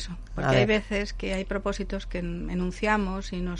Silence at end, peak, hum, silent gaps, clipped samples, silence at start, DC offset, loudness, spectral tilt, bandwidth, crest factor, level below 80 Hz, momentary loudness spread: 0 s; -10 dBFS; none; none; under 0.1%; 0 s; under 0.1%; -28 LUFS; -6 dB/octave; 11 kHz; 18 dB; -36 dBFS; 10 LU